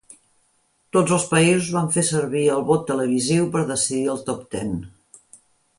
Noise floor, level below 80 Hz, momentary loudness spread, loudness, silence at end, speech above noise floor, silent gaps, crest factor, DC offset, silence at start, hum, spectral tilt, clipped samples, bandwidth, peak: -65 dBFS; -54 dBFS; 11 LU; -21 LUFS; 0.9 s; 44 dB; none; 18 dB; under 0.1%; 0.95 s; none; -4.5 dB/octave; under 0.1%; 11.5 kHz; -4 dBFS